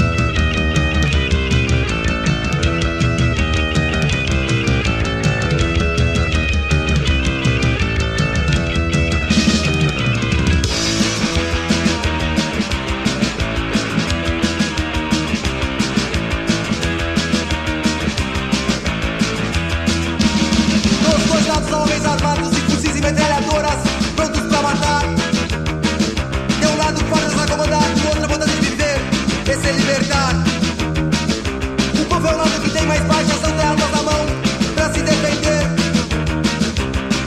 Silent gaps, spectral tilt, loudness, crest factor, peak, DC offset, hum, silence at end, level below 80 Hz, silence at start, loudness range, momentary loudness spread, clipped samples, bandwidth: none; -4.5 dB/octave; -17 LUFS; 16 dB; 0 dBFS; under 0.1%; none; 0 s; -24 dBFS; 0 s; 3 LU; 4 LU; under 0.1%; 13.5 kHz